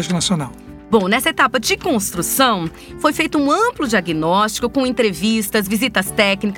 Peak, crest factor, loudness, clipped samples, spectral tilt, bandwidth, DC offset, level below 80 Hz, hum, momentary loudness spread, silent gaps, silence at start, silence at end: -2 dBFS; 16 dB; -17 LUFS; under 0.1%; -3.5 dB/octave; 19 kHz; under 0.1%; -44 dBFS; none; 4 LU; none; 0 s; 0 s